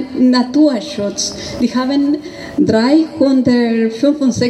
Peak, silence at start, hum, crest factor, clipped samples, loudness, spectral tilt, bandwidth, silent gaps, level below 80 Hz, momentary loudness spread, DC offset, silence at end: -2 dBFS; 0 s; none; 12 dB; under 0.1%; -14 LUFS; -5 dB/octave; 11 kHz; none; -48 dBFS; 8 LU; under 0.1%; 0 s